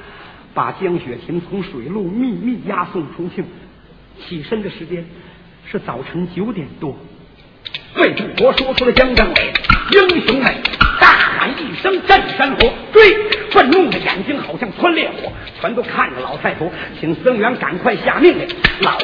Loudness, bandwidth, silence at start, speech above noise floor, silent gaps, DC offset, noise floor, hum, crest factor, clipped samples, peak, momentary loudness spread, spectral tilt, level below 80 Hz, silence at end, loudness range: -14 LUFS; 5.4 kHz; 0 s; 27 dB; none; under 0.1%; -43 dBFS; none; 16 dB; 0.2%; 0 dBFS; 16 LU; -6.5 dB/octave; -32 dBFS; 0 s; 14 LU